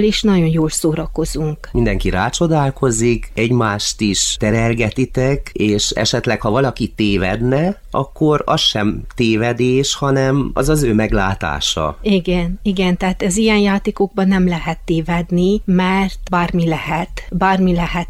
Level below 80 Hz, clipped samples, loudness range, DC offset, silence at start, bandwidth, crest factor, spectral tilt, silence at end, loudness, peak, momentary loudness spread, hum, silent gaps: -30 dBFS; under 0.1%; 1 LU; under 0.1%; 0 s; 15 kHz; 14 dB; -5 dB/octave; 0 s; -16 LUFS; -2 dBFS; 5 LU; none; none